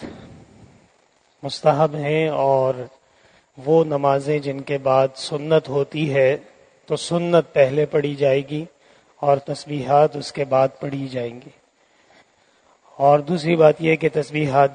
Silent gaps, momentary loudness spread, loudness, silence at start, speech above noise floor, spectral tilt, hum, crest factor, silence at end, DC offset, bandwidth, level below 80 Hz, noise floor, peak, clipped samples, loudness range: none; 12 LU; -20 LUFS; 0 s; 41 dB; -6.5 dB/octave; none; 20 dB; 0 s; under 0.1%; 9.6 kHz; -62 dBFS; -60 dBFS; 0 dBFS; under 0.1%; 3 LU